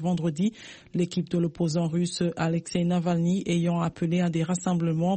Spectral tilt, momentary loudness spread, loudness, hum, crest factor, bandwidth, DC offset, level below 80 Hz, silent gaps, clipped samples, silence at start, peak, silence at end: -6.5 dB/octave; 4 LU; -27 LUFS; none; 12 dB; 8.8 kHz; under 0.1%; -60 dBFS; none; under 0.1%; 0 s; -14 dBFS; 0 s